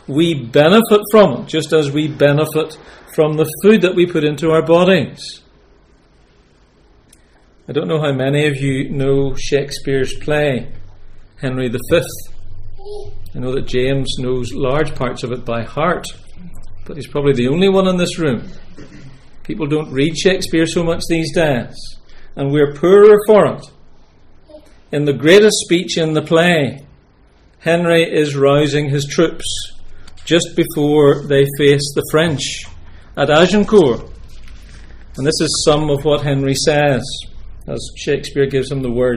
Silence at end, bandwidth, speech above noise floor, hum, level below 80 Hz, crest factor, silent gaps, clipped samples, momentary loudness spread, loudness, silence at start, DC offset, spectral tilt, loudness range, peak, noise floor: 0 s; 16 kHz; 36 dB; none; -34 dBFS; 16 dB; none; under 0.1%; 15 LU; -15 LUFS; 0.1 s; under 0.1%; -5.5 dB/octave; 7 LU; 0 dBFS; -50 dBFS